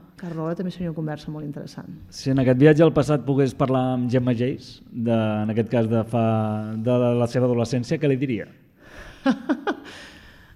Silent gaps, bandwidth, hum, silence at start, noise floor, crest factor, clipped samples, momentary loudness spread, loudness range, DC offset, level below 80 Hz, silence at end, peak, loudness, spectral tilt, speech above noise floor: none; 12 kHz; none; 0.2 s; -44 dBFS; 20 dB; under 0.1%; 17 LU; 3 LU; under 0.1%; -52 dBFS; 0.25 s; -2 dBFS; -22 LUFS; -8 dB/octave; 23 dB